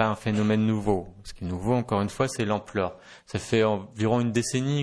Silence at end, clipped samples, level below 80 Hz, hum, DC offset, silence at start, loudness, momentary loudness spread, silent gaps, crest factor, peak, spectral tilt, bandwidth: 0 s; under 0.1%; -50 dBFS; none; under 0.1%; 0 s; -26 LUFS; 10 LU; none; 18 dB; -8 dBFS; -6 dB/octave; 11 kHz